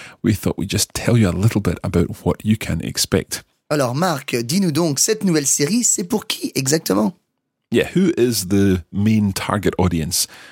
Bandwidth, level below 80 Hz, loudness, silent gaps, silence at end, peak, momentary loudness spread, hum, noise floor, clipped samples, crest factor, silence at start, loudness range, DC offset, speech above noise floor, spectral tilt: 17 kHz; -42 dBFS; -18 LUFS; none; 0 s; 0 dBFS; 6 LU; none; -74 dBFS; under 0.1%; 18 dB; 0 s; 2 LU; under 0.1%; 55 dB; -4.5 dB/octave